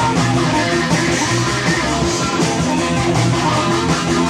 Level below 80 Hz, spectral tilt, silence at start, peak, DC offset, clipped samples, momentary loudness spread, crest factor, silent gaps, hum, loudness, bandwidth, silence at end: -36 dBFS; -4.5 dB/octave; 0 s; -2 dBFS; under 0.1%; under 0.1%; 1 LU; 12 dB; none; none; -16 LUFS; 15 kHz; 0 s